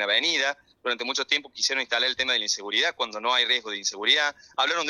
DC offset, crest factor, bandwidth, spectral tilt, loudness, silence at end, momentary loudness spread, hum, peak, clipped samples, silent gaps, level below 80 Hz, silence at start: under 0.1%; 18 dB; 13.5 kHz; 1 dB/octave; -24 LUFS; 0 s; 7 LU; none; -8 dBFS; under 0.1%; none; -72 dBFS; 0 s